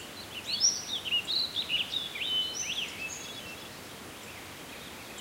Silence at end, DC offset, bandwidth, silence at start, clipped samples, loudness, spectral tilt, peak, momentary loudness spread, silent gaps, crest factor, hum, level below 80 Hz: 0 s; under 0.1%; 16 kHz; 0 s; under 0.1%; -30 LUFS; 0 dB/octave; -14 dBFS; 17 LU; none; 22 dB; none; -64 dBFS